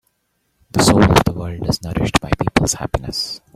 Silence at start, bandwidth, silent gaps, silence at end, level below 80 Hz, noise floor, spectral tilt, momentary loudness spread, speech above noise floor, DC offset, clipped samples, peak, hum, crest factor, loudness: 0.75 s; 16 kHz; none; 0.2 s; -32 dBFS; -68 dBFS; -4.5 dB/octave; 11 LU; 51 dB; under 0.1%; under 0.1%; 0 dBFS; none; 18 dB; -17 LUFS